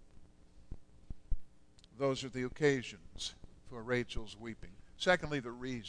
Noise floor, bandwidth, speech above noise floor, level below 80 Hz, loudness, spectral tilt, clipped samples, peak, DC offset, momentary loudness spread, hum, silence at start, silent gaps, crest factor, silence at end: -61 dBFS; 10.5 kHz; 25 dB; -50 dBFS; -37 LUFS; -5 dB/octave; under 0.1%; -16 dBFS; under 0.1%; 24 LU; none; 0 s; none; 22 dB; 0 s